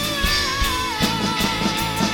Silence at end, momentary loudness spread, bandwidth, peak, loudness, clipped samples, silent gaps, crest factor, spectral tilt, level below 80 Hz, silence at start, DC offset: 0 s; 2 LU; over 20 kHz; -6 dBFS; -20 LUFS; under 0.1%; none; 14 dB; -3 dB/octave; -32 dBFS; 0 s; under 0.1%